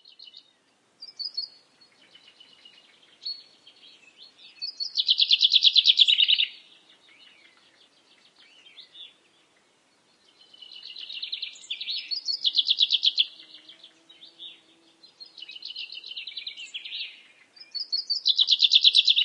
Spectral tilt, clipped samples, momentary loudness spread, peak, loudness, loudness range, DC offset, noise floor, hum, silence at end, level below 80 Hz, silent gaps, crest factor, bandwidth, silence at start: 3.5 dB/octave; under 0.1%; 25 LU; -4 dBFS; -21 LUFS; 20 LU; under 0.1%; -66 dBFS; none; 0 s; under -90 dBFS; none; 24 dB; 11 kHz; 1 s